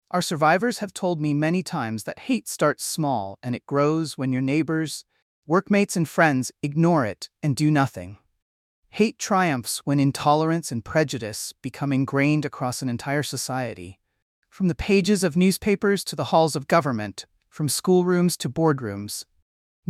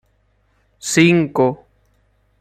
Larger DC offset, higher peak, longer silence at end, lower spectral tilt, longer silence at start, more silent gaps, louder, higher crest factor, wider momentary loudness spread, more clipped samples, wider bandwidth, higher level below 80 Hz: neither; about the same, -4 dBFS vs -2 dBFS; second, 0.7 s vs 0.85 s; about the same, -5.5 dB/octave vs -5 dB/octave; second, 0.15 s vs 0.85 s; first, 5.22-5.42 s, 8.42-8.82 s, 14.22-14.42 s vs none; second, -23 LUFS vs -15 LUFS; about the same, 18 dB vs 18 dB; second, 11 LU vs 16 LU; neither; about the same, 15.5 kHz vs 14.5 kHz; about the same, -54 dBFS vs -56 dBFS